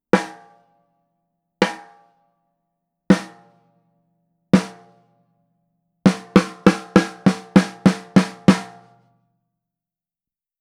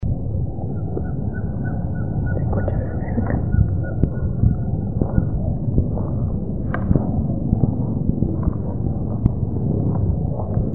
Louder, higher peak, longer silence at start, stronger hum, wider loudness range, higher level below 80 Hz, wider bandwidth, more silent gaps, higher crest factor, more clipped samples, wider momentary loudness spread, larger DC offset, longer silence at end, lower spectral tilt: first, -19 LUFS vs -22 LUFS; about the same, 0 dBFS vs 0 dBFS; first, 0.15 s vs 0 s; neither; first, 8 LU vs 1 LU; second, -52 dBFS vs -28 dBFS; first, 11.5 kHz vs 2.4 kHz; neither; about the same, 22 dB vs 20 dB; neither; first, 11 LU vs 5 LU; second, under 0.1% vs 3%; first, 1.95 s vs 0 s; second, -6.5 dB/octave vs -14 dB/octave